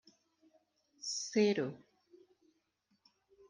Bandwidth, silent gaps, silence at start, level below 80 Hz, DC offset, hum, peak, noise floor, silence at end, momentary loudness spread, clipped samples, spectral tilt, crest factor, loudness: 10 kHz; none; 1 s; -88 dBFS; under 0.1%; none; -20 dBFS; -79 dBFS; 1.75 s; 14 LU; under 0.1%; -4 dB/octave; 22 dB; -35 LUFS